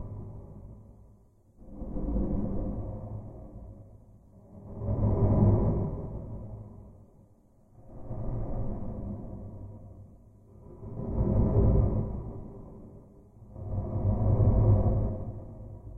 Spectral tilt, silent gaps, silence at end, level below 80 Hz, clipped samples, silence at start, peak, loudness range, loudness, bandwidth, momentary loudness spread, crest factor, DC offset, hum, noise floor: -13.5 dB/octave; none; 0 s; -36 dBFS; under 0.1%; 0 s; -10 dBFS; 11 LU; -30 LUFS; 2.3 kHz; 25 LU; 20 dB; under 0.1%; none; -60 dBFS